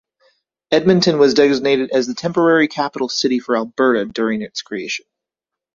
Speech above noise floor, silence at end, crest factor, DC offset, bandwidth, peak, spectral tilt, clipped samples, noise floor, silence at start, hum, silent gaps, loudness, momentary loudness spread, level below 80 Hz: 69 dB; 0.8 s; 16 dB; under 0.1%; 7.4 kHz; -2 dBFS; -5 dB/octave; under 0.1%; -85 dBFS; 0.7 s; none; none; -17 LUFS; 11 LU; -58 dBFS